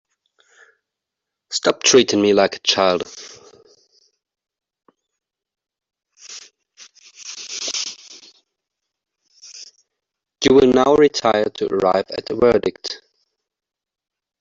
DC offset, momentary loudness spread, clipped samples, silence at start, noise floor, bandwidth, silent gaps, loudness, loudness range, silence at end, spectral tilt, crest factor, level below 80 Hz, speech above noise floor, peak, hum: under 0.1%; 24 LU; under 0.1%; 1.5 s; -83 dBFS; 7.8 kHz; none; -17 LUFS; 14 LU; 1.45 s; -3 dB/octave; 20 dB; -54 dBFS; 66 dB; 0 dBFS; none